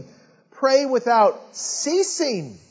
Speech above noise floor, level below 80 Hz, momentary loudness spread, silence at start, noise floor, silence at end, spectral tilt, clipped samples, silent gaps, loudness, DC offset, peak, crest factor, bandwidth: 32 dB; -72 dBFS; 9 LU; 0 s; -52 dBFS; 0.15 s; -3 dB/octave; under 0.1%; none; -20 LUFS; under 0.1%; -4 dBFS; 16 dB; 8 kHz